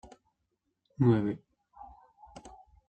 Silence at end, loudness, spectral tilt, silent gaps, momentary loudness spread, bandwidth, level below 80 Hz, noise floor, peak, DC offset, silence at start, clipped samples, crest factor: 0.4 s; -29 LUFS; -9.5 dB/octave; none; 27 LU; 8.4 kHz; -62 dBFS; -81 dBFS; -14 dBFS; under 0.1%; 1 s; under 0.1%; 20 dB